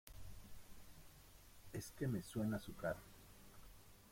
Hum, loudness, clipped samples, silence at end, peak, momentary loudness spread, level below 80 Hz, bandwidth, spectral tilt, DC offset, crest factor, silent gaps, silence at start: none; -46 LUFS; under 0.1%; 0 s; -30 dBFS; 20 LU; -64 dBFS; 16.5 kHz; -6 dB/octave; under 0.1%; 18 dB; none; 0.05 s